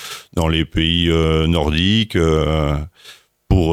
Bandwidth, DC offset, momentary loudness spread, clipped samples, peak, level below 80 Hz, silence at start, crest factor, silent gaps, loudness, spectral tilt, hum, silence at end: 15 kHz; under 0.1%; 6 LU; under 0.1%; -2 dBFS; -26 dBFS; 0 s; 14 dB; none; -17 LUFS; -6 dB/octave; none; 0 s